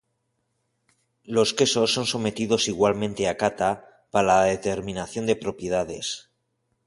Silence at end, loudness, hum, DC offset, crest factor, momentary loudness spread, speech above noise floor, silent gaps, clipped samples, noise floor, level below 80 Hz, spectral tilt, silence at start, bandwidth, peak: 0.65 s; -24 LUFS; none; under 0.1%; 20 dB; 10 LU; 51 dB; none; under 0.1%; -75 dBFS; -54 dBFS; -3.5 dB/octave; 1.3 s; 11.5 kHz; -6 dBFS